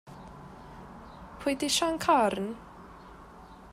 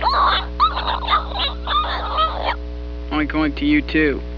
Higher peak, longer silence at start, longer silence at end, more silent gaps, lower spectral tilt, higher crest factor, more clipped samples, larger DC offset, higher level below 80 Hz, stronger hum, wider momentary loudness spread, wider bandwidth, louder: second, -12 dBFS vs -4 dBFS; about the same, 0.05 s vs 0 s; about the same, 0 s vs 0 s; neither; second, -3 dB/octave vs -7 dB/octave; about the same, 20 dB vs 16 dB; neither; second, under 0.1% vs 0.3%; second, -56 dBFS vs -28 dBFS; second, none vs 60 Hz at -30 dBFS; first, 25 LU vs 8 LU; first, 16 kHz vs 5.4 kHz; second, -28 LUFS vs -19 LUFS